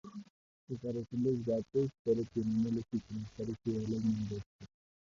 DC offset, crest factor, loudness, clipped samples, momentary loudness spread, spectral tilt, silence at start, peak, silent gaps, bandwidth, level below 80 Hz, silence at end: under 0.1%; 16 dB; -36 LUFS; under 0.1%; 11 LU; -8.5 dB/octave; 0.05 s; -20 dBFS; 0.30-0.67 s, 1.99-2.05 s, 4.46-4.59 s; 7.4 kHz; -62 dBFS; 0.35 s